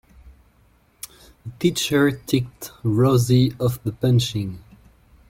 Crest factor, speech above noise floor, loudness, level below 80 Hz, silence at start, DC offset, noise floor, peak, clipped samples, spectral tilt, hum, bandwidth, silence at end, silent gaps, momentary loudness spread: 16 dB; 38 dB; -21 LUFS; -50 dBFS; 0.25 s; under 0.1%; -58 dBFS; -6 dBFS; under 0.1%; -6 dB/octave; none; 17 kHz; 0.7 s; none; 21 LU